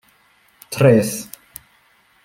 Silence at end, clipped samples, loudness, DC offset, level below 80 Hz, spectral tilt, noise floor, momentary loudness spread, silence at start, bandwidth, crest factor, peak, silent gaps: 1 s; under 0.1%; -16 LUFS; under 0.1%; -56 dBFS; -6 dB/octave; -57 dBFS; 26 LU; 0.7 s; 16.5 kHz; 20 dB; -2 dBFS; none